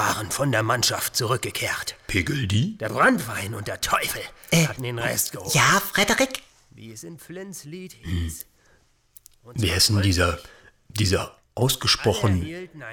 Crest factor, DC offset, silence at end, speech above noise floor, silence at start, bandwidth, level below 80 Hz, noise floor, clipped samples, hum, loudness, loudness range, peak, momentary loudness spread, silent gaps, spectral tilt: 16 dB; under 0.1%; 0 s; 36 dB; 0 s; 19.5 kHz; -44 dBFS; -60 dBFS; under 0.1%; none; -22 LUFS; 5 LU; -8 dBFS; 18 LU; none; -3.5 dB/octave